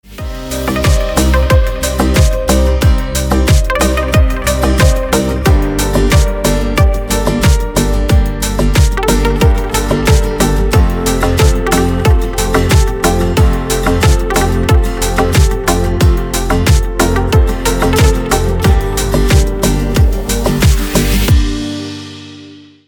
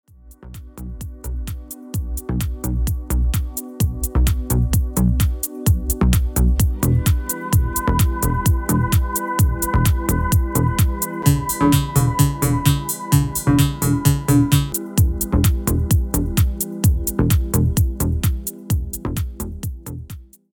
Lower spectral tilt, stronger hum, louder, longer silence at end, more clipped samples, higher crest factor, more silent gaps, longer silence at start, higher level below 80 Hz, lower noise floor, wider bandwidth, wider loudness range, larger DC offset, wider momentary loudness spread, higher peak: about the same, -5 dB/octave vs -5.5 dB/octave; neither; first, -12 LUFS vs -19 LUFS; about the same, 0.3 s vs 0.3 s; neither; second, 10 dB vs 18 dB; neither; second, 0.1 s vs 0.25 s; first, -14 dBFS vs -24 dBFS; second, -35 dBFS vs -41 dBFS; about the same, over 20 kHz vs over 20 kHz; second, 1 LU vs 5 LU; neither; second, 4 LU vs 12 LU; about the same, 0 dBFS vs 0 dBFS